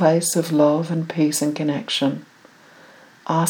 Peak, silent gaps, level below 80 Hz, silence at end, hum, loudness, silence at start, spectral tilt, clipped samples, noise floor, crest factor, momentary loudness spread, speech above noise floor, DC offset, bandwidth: -4 dBFS; none; -78 dBFS; 0 s; none; -20 LUFS; 0 s; -5 dB/octave; under 0.1%; -49 dBFS; 18 dB; 7 LU; 29 dB; under 0.1%; 20 kHz